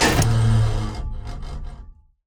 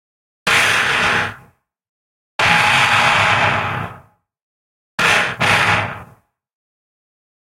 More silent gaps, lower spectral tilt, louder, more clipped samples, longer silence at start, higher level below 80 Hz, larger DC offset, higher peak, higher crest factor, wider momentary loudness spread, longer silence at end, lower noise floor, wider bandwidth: second, none vs 1.89-2.39 s, 4.43-4.98 s; first, -5 dB/octave vs -2.5 dB/octave; second, -21 LUFS vs -14 LUFS; neither; second, 0 s vs 0.45 s; first, -28 dBFS vs -48 dBFS; neither; second, -4 dBFS vs 0 dBFS; about the same, 16 dB vs 18 dB; first, 18 LU vs 15 LU; second, 0.35 s vs 1.45 s; second, -43 dBFS vs -51 dBFS; first, over 20 kHz vs 16.5 kHz